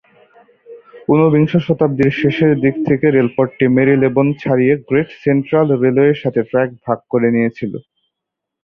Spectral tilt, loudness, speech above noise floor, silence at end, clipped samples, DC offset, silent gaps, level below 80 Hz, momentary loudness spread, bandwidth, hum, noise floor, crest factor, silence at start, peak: -10 dB/octave; -14 LUFS; 66 dB; 0.85 s; under 0.1%; under 0.1%; none; -52 dBFS; 6 LU; 6 kHz; none; -80 dBFS; 14 dB; 0.7 s; -2 dBFS